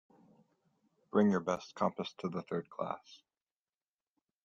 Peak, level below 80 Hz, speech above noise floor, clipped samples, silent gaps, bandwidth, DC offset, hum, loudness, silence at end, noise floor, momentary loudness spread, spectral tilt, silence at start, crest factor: -16 dBFS; -78 dBFS; over 55 dB; under 0.1%; none; 7.4 kHz; under 0.1%; none; -36 LUFS; 1.3 s; under -90 dBFS; 11 LU; -7 dB/octave; 1.15 s; 22 dB